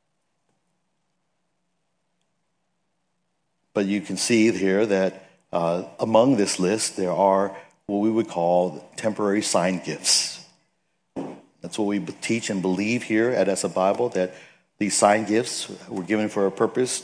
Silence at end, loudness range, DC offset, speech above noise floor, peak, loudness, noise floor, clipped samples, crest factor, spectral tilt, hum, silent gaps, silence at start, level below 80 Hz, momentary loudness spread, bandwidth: 0 s; 4 LU; under 0.1%; 53 dB; -2 dBFS; -23 LUFS; -76 dBFS; under 0.1%; 22 dB; -4 dB/octave; none; none; 3.75 s; -72 dBFS; 11 LU; 10.5 kHz